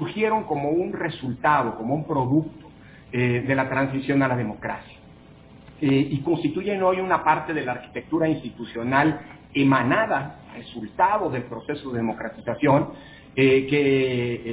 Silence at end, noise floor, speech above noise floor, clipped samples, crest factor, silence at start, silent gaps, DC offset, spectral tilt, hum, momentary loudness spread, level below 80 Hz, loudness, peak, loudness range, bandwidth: 0 s; -48 dBFS; 25 dB; under 0.1%; 18 dB; 0 s; none; under 0.1%; -10.5 dB/octave; none; 12 LU; -54 dBFS; -23 LUFS; -4 dBFS; 2 LU; 4 kHz